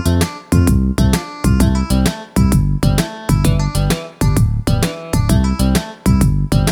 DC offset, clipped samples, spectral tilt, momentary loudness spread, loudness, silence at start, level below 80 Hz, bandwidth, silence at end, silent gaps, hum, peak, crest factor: under 0.1%; under 0.1%; -6 dB/octave; 4 LU; -16 LUFS; 0 s; -20 dBFS; 18.5 kHz; 0 s; none; none; 0 dBFS; 14 dB